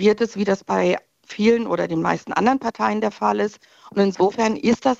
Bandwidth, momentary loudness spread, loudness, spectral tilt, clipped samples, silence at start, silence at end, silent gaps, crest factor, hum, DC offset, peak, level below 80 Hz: 8 kHz; 5 LU; -21 LUFS; -6 dB/octave; under 0.1%; 0 s; 0.05 s; none; 16 dB; none; under 0.1%; -4 dBFS; -58 dBFS